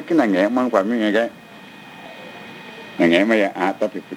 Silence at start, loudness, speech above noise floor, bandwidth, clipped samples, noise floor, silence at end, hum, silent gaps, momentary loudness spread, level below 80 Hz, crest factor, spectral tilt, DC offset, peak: 0 s; -18 LUFS; 23 dB; 16 kHz; under 0.1%; -41 dBFS; 0 s; none; none; 22 LU; -70 dBFS; 18 dB; -6 dB/octave; under 0.1%; -2 dBFS